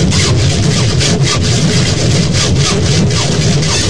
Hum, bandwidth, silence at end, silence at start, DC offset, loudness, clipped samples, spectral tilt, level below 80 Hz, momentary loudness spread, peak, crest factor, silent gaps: none; 10.5 kHz; 0 s; 0 s; 6%; -11 LUFS; under 0.1%; -4.5 dB/octave; -24 dBFS; 1 LU; 0 dBFS; 10 dB; none